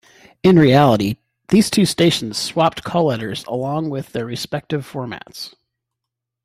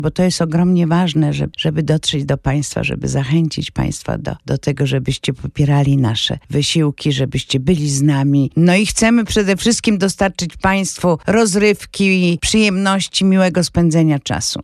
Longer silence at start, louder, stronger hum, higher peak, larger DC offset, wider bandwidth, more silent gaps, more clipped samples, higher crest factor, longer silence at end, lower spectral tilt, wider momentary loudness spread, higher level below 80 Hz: first, 0.45 s vs 0 s; about the same, -17 LUFS vs -16 LUFS; neither; about the same, -2 dBFS vs -2 dBFS; neither; first, 15.5 kHz vs 13 kHz; neither; neither; about the same, 16 dB vs 12 dB; first, 0.95 s vs 0 s; about the same, -5.5 dB/octave vs -5 dB/octave; first, 17 LU vs 7 LU; second, -52 dBFS vs -38 dBFS